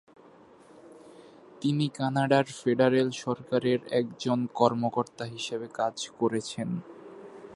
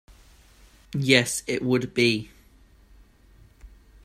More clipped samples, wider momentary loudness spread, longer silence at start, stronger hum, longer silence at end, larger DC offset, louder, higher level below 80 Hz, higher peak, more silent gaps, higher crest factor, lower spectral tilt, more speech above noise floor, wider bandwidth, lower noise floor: neither; about the same, 11 LU vs 12 LU; second, 0.75 s vs 0.95 s; neither; second, 0 s vs 0.4 s; neither; second, -28 LUFS vs -23 LUFS; second, -72 dBFS vs -54 dBFS; second, -6 dBFS vs -2 dBFS; neither; about the same, 22 dB vs 26 dB; first, -6 dB/octave vs -4 dB/octave; second, 27 dB vs 32 dB; second, 11.5 kHz vs 16 kHz; about the same, -54 dBFS vs -55 dBFS